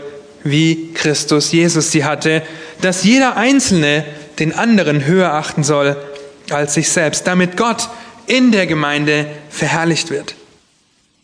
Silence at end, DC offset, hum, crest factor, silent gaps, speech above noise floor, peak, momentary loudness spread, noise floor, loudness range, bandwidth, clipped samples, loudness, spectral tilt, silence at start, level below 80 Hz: 0.9 s; under 0.1%; none; 16 dB; none; 43 dB; 0 dBFS; 12 LU; -57 dBFS; 3 LU; 11 kHz; under 0.1%; -14 LUFS; -4 dB/octave; 0 s; -54 dBFS